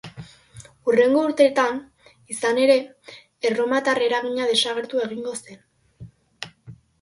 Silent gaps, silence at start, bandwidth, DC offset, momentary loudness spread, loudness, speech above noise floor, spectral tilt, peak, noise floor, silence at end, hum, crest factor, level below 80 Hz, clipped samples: none; 0.05 s; 11.5 kHz; under 0.1%; 20 LU; -21 LUFS; 26 dB; -3.5 dB/octave; -4 dBFS; -47 dBFS; 0.25 s; none; 18 dB; -64 dBFS; under 0.1%